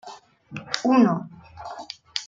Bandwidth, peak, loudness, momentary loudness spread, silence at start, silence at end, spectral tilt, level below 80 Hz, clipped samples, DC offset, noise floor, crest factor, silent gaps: 7.8 kHz; -2 dBFS; -22 LUFS; 23 LU; 0.05 s; 0 s; -5 dB/octave; -64 dBFS; under 0.1%; under 0.1%; -45 dBFS; 22 dB; none